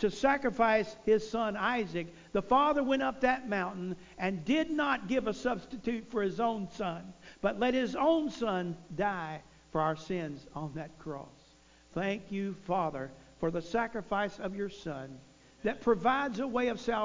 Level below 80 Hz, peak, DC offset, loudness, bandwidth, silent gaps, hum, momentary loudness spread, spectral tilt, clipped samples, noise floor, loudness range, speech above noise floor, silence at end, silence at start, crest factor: -60 dBFS; -14 dBFS; under 0.1%; -32 LUFS; 7.6 kHz; none; none; 13 LU; -6 dB/octave; under 0.1%; -61 dBFS; 7 LU; 29 dB; 0 s; 0 s; 18 dB